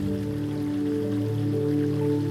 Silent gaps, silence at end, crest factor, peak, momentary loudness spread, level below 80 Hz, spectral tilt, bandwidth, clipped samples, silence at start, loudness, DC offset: none; 0 s; 10 dB; -14 dBFS; 4 LU; -52 dBFS; -8.5 dB/octave; 14 kHz; under 0.1%; 0 s; -27 LUFS; under 0.1%